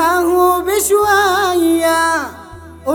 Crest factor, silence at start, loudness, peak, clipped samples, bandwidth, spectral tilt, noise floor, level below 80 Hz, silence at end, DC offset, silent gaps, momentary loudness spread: 12 dB; 0 s; -13 LUFS; -2 dBFS; under 0.1%; over 20 kHz; -3 dB/octave; -35 dBFS; -42 dBFS; 0 s; under 0.1%; none; 7 LU